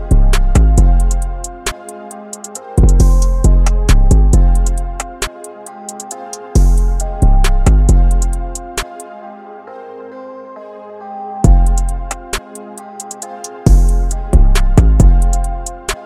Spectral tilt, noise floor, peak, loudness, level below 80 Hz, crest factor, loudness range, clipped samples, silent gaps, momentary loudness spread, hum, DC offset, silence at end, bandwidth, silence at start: -5.5 dB/octave; -32 dBFS; 0 dBFS; -14 LUFS; -12 dBFS; 12 dB; 6 LU; under 0.1%; none; 20 LU; none; under 0.1%; 0 s; 13 kHz; 0 s